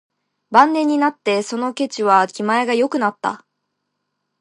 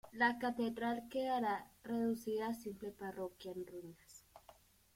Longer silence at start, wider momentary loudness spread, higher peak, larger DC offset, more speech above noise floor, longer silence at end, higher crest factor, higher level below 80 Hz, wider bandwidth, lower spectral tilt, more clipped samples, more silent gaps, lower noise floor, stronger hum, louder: first, 0.5 s vs 0.05 s; second, 9 LU vs 17 LU; first, 0 dBFS vs -20 dBFS; neither; first, 58 dB vs 26 dB; first, 1.05 s vs 0.45 s; about the same, 18 dB vs 20 dB; about the same, -70 dBFS vs -74 dBFS; second, 11 kHz vs 16.5 kHz; about the same, -4.5 dB/octave vs -5 dB/octave; neither; neither; first, -75 dBFS vs -66 dBFS; neither; first, -18 LUFS vs -40 LUFS